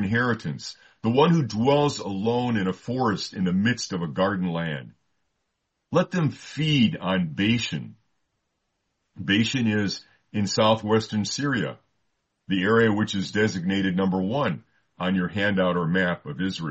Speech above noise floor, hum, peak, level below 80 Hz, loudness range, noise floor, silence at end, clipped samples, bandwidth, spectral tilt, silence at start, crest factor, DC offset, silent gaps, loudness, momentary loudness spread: 54 dB; none; -8 dBFS; -62 dBFS; 3 LU; -78 dBFS; 0 s; under 0.1%; 8.2 kHz; -5.5 dB/octave; 0 s; 18 dB; under 0.1%; none; -24 LUFS; 9 LU